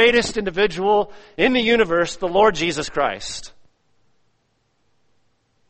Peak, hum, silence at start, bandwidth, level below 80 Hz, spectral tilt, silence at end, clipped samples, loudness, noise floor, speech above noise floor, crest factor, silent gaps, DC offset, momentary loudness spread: -2 dBFS; none; 0 s; 8.8 kHz; -46 dBFS; -3.5 dB/octave; 2.2 s; under 0.1%; -19 LUFS; -67 dBFS; 48 dB; 20 dB; none; under 0.1%; 11 LU